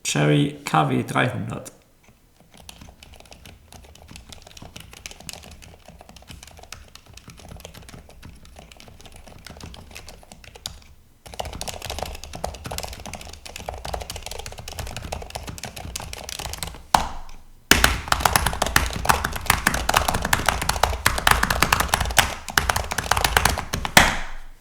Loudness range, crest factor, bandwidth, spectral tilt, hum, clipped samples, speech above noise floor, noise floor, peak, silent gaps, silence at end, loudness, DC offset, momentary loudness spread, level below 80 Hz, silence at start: 23 LU; 26 dB; over 20 kHz; -3 dB/octave; none; under 0.1%; 33 dB; -55 dBFS; 0 dBFS; none; 0.05 s; -22 LUFS; under 0.1%; 24 LU; -36 dBFS; 0.05 s